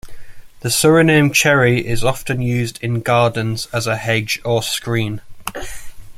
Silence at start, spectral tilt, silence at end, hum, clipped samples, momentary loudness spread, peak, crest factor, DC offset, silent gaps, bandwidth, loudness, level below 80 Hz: 0.05 s; -4.5 dB/octave; 0 s; none; under 0.1%; 16 LU; -2 dBFS; 16 dB; under 0.1%; none; 16 kHz; -16 LUFS; -38 dBFS